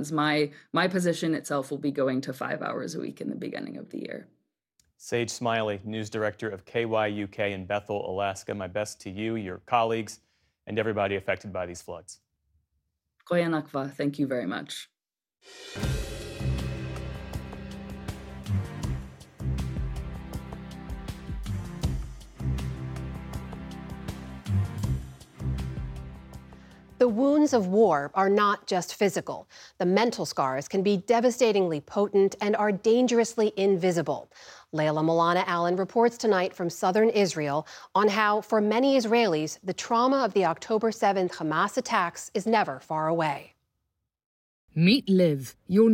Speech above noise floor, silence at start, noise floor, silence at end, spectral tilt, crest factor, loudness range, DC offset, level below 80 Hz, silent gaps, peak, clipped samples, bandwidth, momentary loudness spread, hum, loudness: 62 dB; 0 s; -88 dBFS; 0 s; -5.5 dB/octave; 20 dB; 11 LU; under 0.1%; -46 dBFS; 44.26-44.68 s; -8 dBFS; under 0.1%; 16.5 kHz; 16 LU; none; -27 LUFS